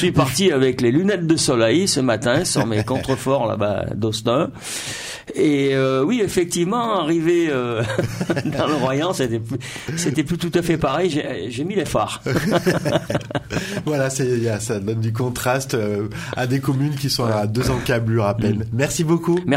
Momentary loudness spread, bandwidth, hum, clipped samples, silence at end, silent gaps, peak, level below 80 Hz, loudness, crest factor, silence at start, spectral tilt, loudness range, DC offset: 7 LU; 16 kHz; none; under 0.1%; 0 s; none; -4 dBFS; -44 dBFS; -20 LUFS; 16 dB; 0 s; -5 dB/octave; 3 LU; under 0.1%